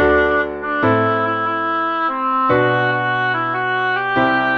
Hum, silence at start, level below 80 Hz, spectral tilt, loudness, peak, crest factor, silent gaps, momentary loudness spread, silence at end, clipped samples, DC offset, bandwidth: none; 0 s; -42 dBFS; -7.5 dB/octave; -17 LUFS; -4 dBFS; 14 dB; none; 4 LU; 0 s; under 0.1%; under 0.1%; 6.6 kHz